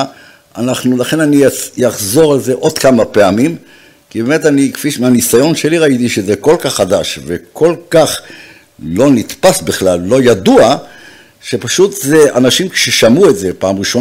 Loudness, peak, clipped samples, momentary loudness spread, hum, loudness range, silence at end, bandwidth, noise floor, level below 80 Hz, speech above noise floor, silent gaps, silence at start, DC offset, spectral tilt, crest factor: -10 LUFS; 0 dBFS; under 0.1%; 11 LU; none; 2 LU; 0 s; 16.5 kHz; -38 dBFS; -46 dBFS; 28 dB; none; 0 s; under 0.1%; -4.5 dB/octave; 10 dB